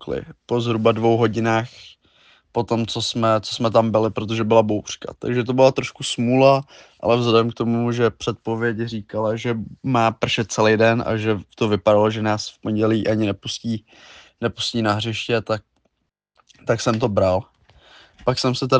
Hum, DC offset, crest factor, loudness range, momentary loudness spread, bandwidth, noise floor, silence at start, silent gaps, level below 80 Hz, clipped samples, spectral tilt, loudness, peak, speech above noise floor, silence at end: none; under 0.1%; 18 dB; 5 LU; 10 LU; 9.6 kHz; -74 dBFS; 0 s; none; -54 dBFS; under 0.1%; -5.5 dB/octave; -20 LUFS; -2 dBFS; 54 dB; 0 s